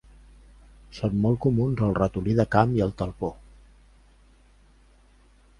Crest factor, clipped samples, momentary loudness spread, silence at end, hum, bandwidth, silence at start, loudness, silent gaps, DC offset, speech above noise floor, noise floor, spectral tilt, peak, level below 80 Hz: 24 dB; under 0.1%; 11 LU; 2.25 s; 50 Hz at -45 dBFS; 10.5 kHz; 0.9 s; -25 LUFS; none; under 0.1%; 33 dB; -57 dBFS; -9 dB/octave; -4 dBFS; -46 dBFS